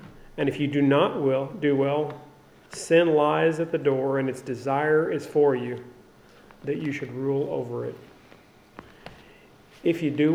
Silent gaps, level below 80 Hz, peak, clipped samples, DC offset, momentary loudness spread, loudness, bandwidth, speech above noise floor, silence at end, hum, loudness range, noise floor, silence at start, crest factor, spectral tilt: none; -62 dBFS; -8 dBFS; under 0.1%; under 0.1%; 16 LU; -25 LUFS; 13.5 kHz; 29 dB; 0 s; none; 9 LU; -53 dBFS; 0 s; 18 dB; -6.5 dB/octave